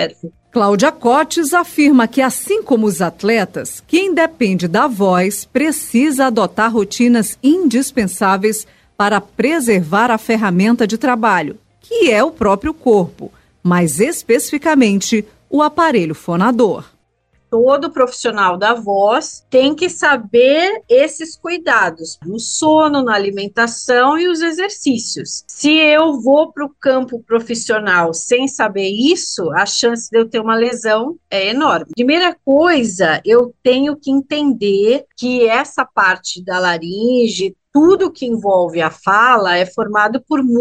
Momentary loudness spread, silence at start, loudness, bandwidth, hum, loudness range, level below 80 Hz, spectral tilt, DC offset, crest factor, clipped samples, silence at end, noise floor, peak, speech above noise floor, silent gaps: 7 LU; 0 s; -14 LUFS; 15.5 kHz; none; 2 LU; -52 dBFS; -4 dB/octave; under 0.1%; 14 dB; under 0.1%; 0 s; -60 dBFS; 0 dBFS; 46 dB; none